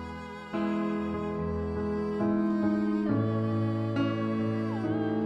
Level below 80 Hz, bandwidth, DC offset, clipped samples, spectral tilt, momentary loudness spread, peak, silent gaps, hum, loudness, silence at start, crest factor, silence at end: -54 dBFS; 7.8 kHz; under 0.1%; under 0.1%; -9 dB/octave; 5 LU; -16 dBFS; none; none; -30 LUFS; 0 s; 14 dB; 0 s